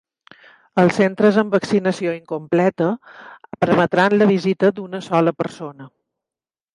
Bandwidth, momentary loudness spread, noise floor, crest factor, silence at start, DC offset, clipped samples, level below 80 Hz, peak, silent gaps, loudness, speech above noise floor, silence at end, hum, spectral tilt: 11 kHz; 12 LU; under -90 dBFS; 18 dB; 0.75 s; under 0.1%; under 0.1%; -62 dBFS; -2 dBFS; none; -18 LUFS; over 72 dB; 0.9 s; none; -7 dB/octave